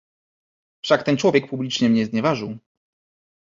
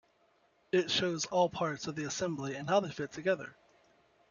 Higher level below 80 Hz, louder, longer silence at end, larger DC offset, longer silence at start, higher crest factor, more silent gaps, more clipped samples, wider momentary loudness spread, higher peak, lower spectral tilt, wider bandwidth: first, -62 dBFS vs -70 dBFS; first, -20 LUFS vs -33 LUFS; about the same, 0.85 s vs 0.8 s; neither; about the same, 0.85 s vs 0.75 s; about the same, 20 dB vs 18 dB; neither; neither; first, 14 LU vs 8 LU; first, -2 dBFS vs -16 dBFS; first, -5.5 dB/octave vs -4 dB/octave; about the same, 7.6 kHz vs 7.4 kHz